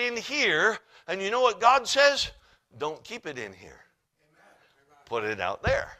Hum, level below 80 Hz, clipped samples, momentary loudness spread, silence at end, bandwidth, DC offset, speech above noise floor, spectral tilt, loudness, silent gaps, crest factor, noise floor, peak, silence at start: none; -52 dBFS; under 0.1%; 16 LU; 0.05 s; 14.5 kHz; under 0.1%; 43 dB; -2.5 dB/octave; -25 LUFS; none; 22 dB; -69 dBFS; -4 dBFS; 0 s